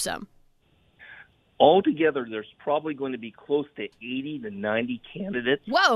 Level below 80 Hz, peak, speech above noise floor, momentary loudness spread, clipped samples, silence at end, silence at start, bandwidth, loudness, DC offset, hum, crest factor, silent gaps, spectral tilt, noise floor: -64 dBFS; -4 dBFS; 38 dB; 16 LU; under 0.1%; 0 s; 0 s; 15 kHz; -26 LUFS; under 0.1%; none; 24 dB; none; -4 dB/octave; -63 dBFS